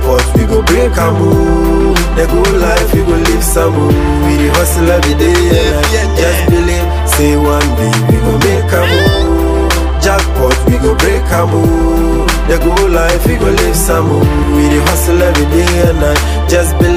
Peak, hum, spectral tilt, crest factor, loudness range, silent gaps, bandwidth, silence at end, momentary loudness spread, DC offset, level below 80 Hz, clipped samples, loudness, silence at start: 0 dBFS; none; -5.5 dB/octave; 8 dB; 1 LU; none; 16.5 kHz; 0 s; 2 LU; under 0.1%; -14 dBFS; under 0.1%; -10 LUFS; 0 s